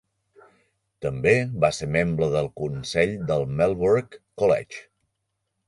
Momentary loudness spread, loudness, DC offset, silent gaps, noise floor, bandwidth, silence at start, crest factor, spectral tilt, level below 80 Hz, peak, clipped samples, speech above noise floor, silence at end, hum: 10 LU; -23 LUFS; under 0.1%; none; -78 dBFS; 11.5 kHz; 1 s; 20 dB; -6 dB/octave; -50 dBFS; -4 dBFS; under 0.1%; 55 dB; 0.85 s; none